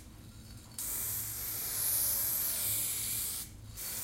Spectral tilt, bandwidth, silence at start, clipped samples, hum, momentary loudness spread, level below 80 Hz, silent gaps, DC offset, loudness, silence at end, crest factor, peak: -0.5 dB/octave; 16 kHz; 0 s; under 0.1%; none; 19 LU; -56 dBFS; none; under 0.1%; -32 LUFS; 0 s; 16 dB; -20 dBFS